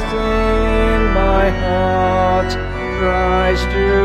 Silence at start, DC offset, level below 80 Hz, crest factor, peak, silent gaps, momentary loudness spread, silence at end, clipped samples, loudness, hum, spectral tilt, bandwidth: 0 s; under 0.1%; -20 dBFS; 12 dB; -2 dBFS; none; 4 LU; 0 s; under 0.1%; -16 LUFS; none; -6.5 dB/octave; 9.4 kHz